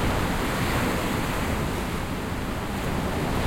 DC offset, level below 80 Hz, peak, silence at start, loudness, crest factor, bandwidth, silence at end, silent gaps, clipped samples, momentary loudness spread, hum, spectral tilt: under 0.1%; -34 dBFS; -12 dBFS; 0 s; -27 LUFS; 14 dB; 16.5 kHz; 0 s; none; under 0.1%; 5 LU; none; -5 dB/octave